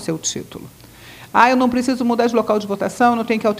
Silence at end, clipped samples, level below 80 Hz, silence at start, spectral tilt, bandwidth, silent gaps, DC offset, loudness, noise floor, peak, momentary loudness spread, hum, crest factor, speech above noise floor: 0 s; under 0.1%; -54 dBFS; 0 s; -4 dB/octave; 16 kHz; none; under 0.1%; -17 LUFS; -41 dBFS; 0 dBFS; 12 LU; none; 18 dB; 23 dB